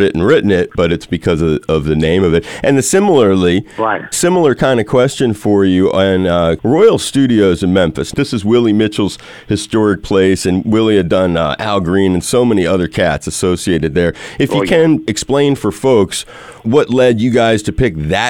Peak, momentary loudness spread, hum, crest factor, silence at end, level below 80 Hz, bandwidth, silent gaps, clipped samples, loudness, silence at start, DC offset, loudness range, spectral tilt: 0 dBFS; 6 LU; none; 12 dB; 0 s; -34 dBFS; 16.5 kHz; none; under 0.1%; -13 LUFS; 0 s; 0.3%; 2 LU; -5.5 dB/octave